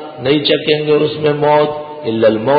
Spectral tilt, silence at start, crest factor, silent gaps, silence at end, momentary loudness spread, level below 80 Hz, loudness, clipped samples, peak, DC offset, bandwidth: -11.5 dB/octave; 0 s; 12 dB; none; 0 s; 6 LU; -52 dBFS; -14 LUFS; under 0.1%; -2 dBFS; under 0.1%; 5 kHz